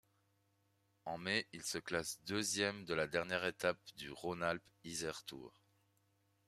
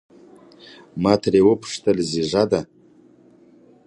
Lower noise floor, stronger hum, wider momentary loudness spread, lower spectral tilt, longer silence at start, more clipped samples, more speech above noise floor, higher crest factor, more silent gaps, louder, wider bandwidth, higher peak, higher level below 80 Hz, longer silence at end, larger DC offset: first, -78 dBFS vs -52 dBFS; neither; first, 12 LU vs 9 LU; second, -3 dB/octave vs -6 dB/octave; about the same, 1.05 s vs 0.95 s; neither; first, 37 dB vs 32 dB; about the same, 24 dB vs 20 dB; neither; second, -40 LUFS vs -19 LUFS; first, 14.5 kHz vs 11 kHz; second, -20 dBFS vs -2 dBFS; second, -74 dBFS vs -52 dBFS; second, 1 s vs 1.25 s; neither